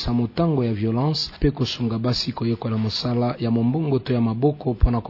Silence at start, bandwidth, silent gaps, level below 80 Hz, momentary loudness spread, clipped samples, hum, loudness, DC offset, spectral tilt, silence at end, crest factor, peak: 0 s; 6 kHz; none; -32 dBFS; 3 LU; under 0.1%; none; -22 LUFS; under 0.1%; -7.5 dB/octave; 0 s; 18 dB; -4 dBFS